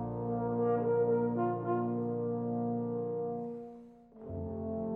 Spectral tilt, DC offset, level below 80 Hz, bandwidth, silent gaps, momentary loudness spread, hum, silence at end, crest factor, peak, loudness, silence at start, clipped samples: -12.5 dB/octave; under 0.1%; -64 dBFS; 3 kHz; none; 14 LU; none; 0 s; 12 dB; -22 dBFS; -34 LUFS; 0 s; under 0.1%